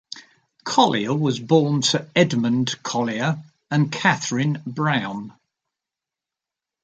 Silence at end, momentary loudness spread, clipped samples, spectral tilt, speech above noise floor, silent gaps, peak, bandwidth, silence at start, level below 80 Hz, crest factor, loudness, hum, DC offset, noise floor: 1.55 s; 13 LU; under 0.1%; -5 dB/octave; 67 dB; none; -2 dBFS; 9.2 kHz; 0.15 s; -64 dBFS; 20 dB; -21 LUFS; none; under 0.1%; -88 dBFS